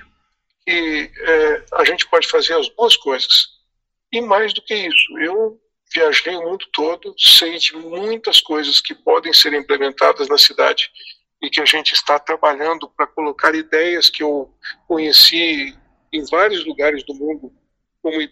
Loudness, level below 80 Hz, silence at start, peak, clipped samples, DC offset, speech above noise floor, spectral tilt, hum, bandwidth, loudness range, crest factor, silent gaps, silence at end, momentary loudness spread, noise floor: -14 LUFS; -56 dBFS; 0.65 s; 0 dBFS; under 0.1%; under 0.1%; 57 dB; -0.5 dB/octave; none; 15.5 kHz; 4 LU; 16 dB; none; 0.05 s; 14 LU; -73 dBFS